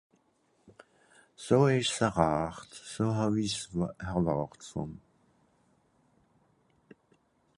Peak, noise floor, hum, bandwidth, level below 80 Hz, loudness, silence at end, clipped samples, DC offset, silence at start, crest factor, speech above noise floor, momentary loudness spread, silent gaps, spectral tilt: -8 dBFS; -71 dBFS; none; 11.5 kHz; -56 dBFS; -30 LUFS; 2.6 s; under 0.1%; under 0.1%; 1.4 s; 24 dB; 41 dB; 17 LU; none; -5.5 dB/octave